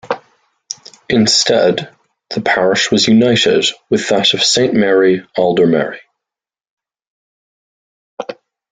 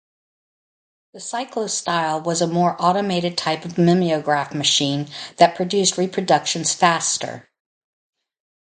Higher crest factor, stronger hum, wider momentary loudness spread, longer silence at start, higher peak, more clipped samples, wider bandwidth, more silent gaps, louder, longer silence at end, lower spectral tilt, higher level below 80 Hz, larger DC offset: second, 14 dB vs 20 dB; neither; first, 18 LU vs 9 LU; second, 0.05 s vs 1.15 s; about the same, 0 dBFS vs 0 dBFS; neither; about the same, 9.6 kHz vs 9.6 kHz; first, 6.69-6.77 s, 7.07-8.17 s vs none; first, -12 LUFS vs -19 LUFS; second, 0.4 s vs 1.3 s; about the same, -3.5 dB/octave vs -3.5 dB/octave; first, -54 dBFS vs -66 dBFS; neither